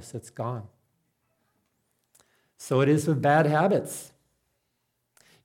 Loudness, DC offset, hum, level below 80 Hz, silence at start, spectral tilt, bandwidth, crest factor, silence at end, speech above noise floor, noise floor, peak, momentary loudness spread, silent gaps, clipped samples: -24 LUFS; under 0.1%; none; -72 dBFS; 0 s; -6.5 dB/octave; 16.5 kHz; 20 dB; 1.4 s; 53 dB; -77 dBFS; -8 dBFS; 18 LU; none; under 0.1%